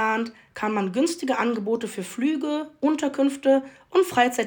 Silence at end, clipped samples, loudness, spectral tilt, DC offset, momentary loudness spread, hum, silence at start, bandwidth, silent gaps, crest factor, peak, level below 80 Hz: 0 s; under 0.1%; -24 LUFS; -4.5 dB/octave; under 0.1%; 7 LU; none; 0 s; 19.5 kHz; none; 16 dB; -6 dBFS; -70 dBFS